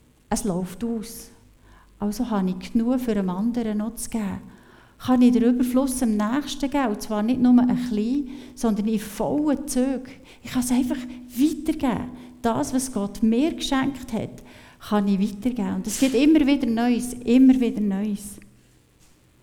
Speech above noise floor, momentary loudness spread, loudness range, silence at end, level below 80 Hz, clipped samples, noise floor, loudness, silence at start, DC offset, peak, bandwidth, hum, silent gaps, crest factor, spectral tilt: 34 dB; 13 LU; 6 LU; 1 s; -46 dBFS; under 0.1%; -56 dBFS; -23 LUFS; 0.3 s; under 0.1%; -6 dBFS; 17.5 kHz; none; none; 16 dB; -5.5 dB/octave